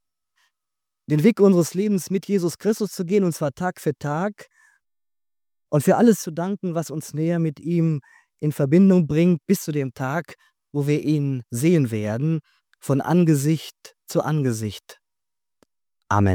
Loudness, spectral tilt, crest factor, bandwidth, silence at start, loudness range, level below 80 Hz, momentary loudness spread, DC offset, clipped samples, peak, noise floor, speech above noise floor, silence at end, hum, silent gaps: -22 LUFS; -7 dB/octave; 18 dB; 18.5 kHz; 1.1 s; 4 LU; -62 dBFS; 11 LU; under 0.1%; under 0.1%; -4 dBFS; under -90 dBFS; over 69 dB; 0 s; none; none